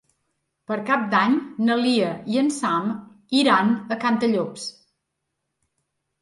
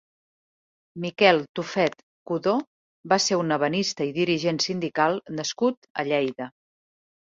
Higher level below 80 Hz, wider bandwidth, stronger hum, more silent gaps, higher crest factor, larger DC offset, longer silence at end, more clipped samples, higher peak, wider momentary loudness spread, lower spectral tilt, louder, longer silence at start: about the same, -72 dBFS vs -68 dBFS; first, 11.5 kHz vs 8 kHz; neither; second, none vs 1.49-1.55 s, 2.03-2.26 s, 2.67-3.04 s, 5.77-5.82 s, 5.90-5.95 s; about the same, 18 dB vs 22 dB; neither; first, 1.5 s vs 0.75 s; neither; about the same, -4 dBFS vs -2 dBFS; about the same, 12 LU vs 11 LU; about the same, -4.5 dB/octave vs -4 dB/octave; about the same, -22 LUFS vs -24 LUFS; second, 0.7 s vs 0.95 s